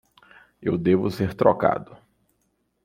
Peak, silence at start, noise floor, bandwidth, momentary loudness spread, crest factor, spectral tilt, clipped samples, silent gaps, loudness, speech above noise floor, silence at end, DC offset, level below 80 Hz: -2 dBFS; 0.6 s; -71 dBFS; 16 kHz; 10 LU; 22 dB; -8.5 dB/octave; under 0.1%; none; -23 LUFS; 49 dB; 0.9 s; under 0.1%; -56 dBFS